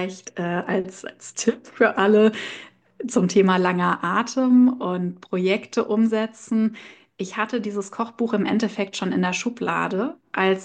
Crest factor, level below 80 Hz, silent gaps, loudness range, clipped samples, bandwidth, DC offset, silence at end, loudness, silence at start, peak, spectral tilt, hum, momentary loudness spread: 18 dB; -68 dBFS; none; 5 LU; under 0.1%; 9.4 kHz; under 0.1%; 0 s; -22 LUFS; 0 s; -4 dBFS; -5.5 dB/octave; none; 13 LU